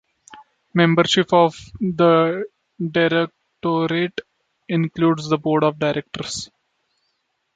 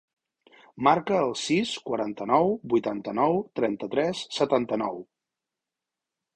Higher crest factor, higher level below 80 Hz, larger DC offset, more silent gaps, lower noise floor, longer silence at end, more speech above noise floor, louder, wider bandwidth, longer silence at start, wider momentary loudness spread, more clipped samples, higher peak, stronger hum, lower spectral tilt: about the same, 18 dB vs 20 dB; first, -58 dBFS vs -66 dBFS; neither; neither; second, -71 dBFS vs -88 dBFS; second, 1.1 s vs 1.35 s; second, 53 dB vs 63 dB; first, -20 LUFS vs -26 LUFS; second, 9.2 kHz vs 10.5 kHz; second, 0.35 s vs 0.75 s; first, 13 LU vs 7 LU; neither; first, -2 dBFS vs -6 dBFS; neither; about the same, -5.5 dB/octave vs -5 dB/octave